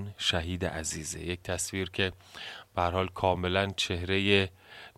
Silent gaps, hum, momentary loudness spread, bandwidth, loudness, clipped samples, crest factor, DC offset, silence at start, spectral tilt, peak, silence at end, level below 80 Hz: none; none; 10 LU; 15 kHz; -30 LUFS; under 0.1%; 24 dB; under 0.1%; 0 s; -3.5 dB/octave; -8 dBFS; 0.1 s; -56 dBFS